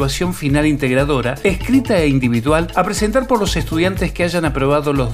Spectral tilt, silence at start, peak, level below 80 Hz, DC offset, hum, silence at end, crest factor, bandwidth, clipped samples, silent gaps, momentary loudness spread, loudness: -5.5 dB/octave; 0 s; 0 dBFS; -28 dBFS; under 0.1%; none; 0 s; 16 dB; 16 kHz; under 0.1%; none; 3 LU; -16 LUFS